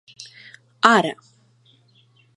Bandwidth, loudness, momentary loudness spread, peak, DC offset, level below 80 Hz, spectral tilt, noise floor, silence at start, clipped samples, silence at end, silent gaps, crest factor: 11.5 kHz; -18 LUFS; 25 LU; 0 dBFS; under 0.1%; -76 dBFS; -4 dB/octave; -57 dBFS; 0.2 s; under 0.1%; 1.25 s; none; 24 dB